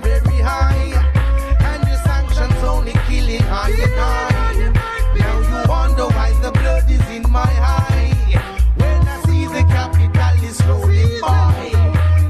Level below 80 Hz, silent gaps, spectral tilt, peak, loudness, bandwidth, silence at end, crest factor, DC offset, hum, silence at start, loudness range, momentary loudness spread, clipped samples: -16 dBFS; none; -6.5 dB/octave; -2 dBFS; -16 LUFS; 13 kHz; 0 s; 12 dB; under 0.1%; none; 0 s; 2 LU; 3 LU; under 0.1%